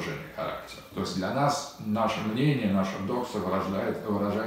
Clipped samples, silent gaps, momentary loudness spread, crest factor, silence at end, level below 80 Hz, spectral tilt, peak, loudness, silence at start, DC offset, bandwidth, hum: under 0.1%; none; 9 LU; 16 dB; 0 s; -60 dBFS; -6 dB/octave; -12 dBFS; -29 LUFS; 0 s; under 0.1%; 16 kHz; none